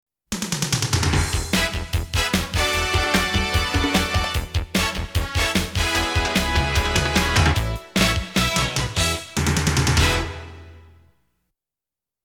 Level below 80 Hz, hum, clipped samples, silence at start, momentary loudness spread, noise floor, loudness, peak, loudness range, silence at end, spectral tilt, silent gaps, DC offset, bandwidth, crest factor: -30 dBFS; none; under 0.1%; 0.3 s; 6 LU; -89 dBFS; -21 LUFS; -4 dBFS; 2 LU; 1.45 s; -3.5 dB/octave; none; under 0.1%; 18.5 kHz; 18 dB